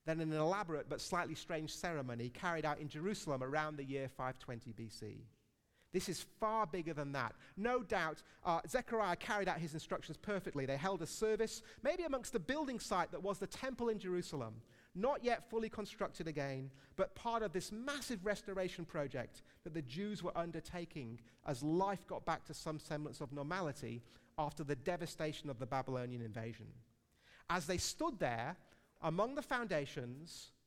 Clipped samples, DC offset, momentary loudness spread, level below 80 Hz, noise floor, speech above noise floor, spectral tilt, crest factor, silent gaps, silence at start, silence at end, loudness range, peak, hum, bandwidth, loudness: under 0.1%; under 0.1%; 11 LU; -64 dBFS; -76 dBFS; 34 dB; -5 dB/octave; 20 dB; none; 0.05 s; 0.15 s; 4 LU; -22 dBFS; none; 16.5 kHz; -42 LUFS